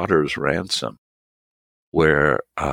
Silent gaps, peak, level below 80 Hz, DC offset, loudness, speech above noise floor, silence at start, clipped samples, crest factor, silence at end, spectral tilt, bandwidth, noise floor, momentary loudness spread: 0.98-1.92 s; -2 dBFS; -44 dBFS; under 0.1%; -20 LUFS; over 70 dB; 0 s; under 0.1%; 20 dB; 0 s; -5 dB/octave; 16 kHz; under -90 dBFS; 9 LU